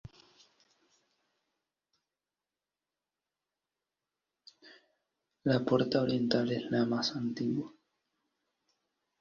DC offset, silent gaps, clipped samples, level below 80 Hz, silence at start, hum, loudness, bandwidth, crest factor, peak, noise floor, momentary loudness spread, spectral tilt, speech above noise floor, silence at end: under 0.1%; none; under 0.1%; -72 dBFS; 0.05 s; 50 Hz at -70 dBFS; -32 LUFS; 7.2 kHz; 22 dB; -14 dBFS; under -90 dBFS; 7 LU; -6.5 dB/octave; over 59 dB; 1.5 s